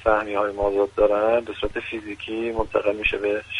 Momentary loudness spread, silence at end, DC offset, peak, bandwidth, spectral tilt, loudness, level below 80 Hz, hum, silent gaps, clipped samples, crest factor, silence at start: 10 LU; 0 s; under 0.1%; -6 dBFS; 10.5 kHz; -5.5 dB/octave; -23 LUFS; -40 dBFS; none; none; under 0.1%; 18 dB; 0 s